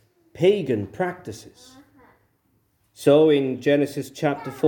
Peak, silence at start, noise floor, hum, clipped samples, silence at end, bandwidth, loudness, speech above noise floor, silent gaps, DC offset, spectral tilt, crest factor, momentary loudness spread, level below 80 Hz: -4 dBFS; 0.35 s; -67 dBFS; none; under 0.1%; 0 s; 18 kHz; -21 LUFS; 45 dB; none; under 0.1%; -6.5 dB/octave; 18 dB; 13 LU; -66 dBFS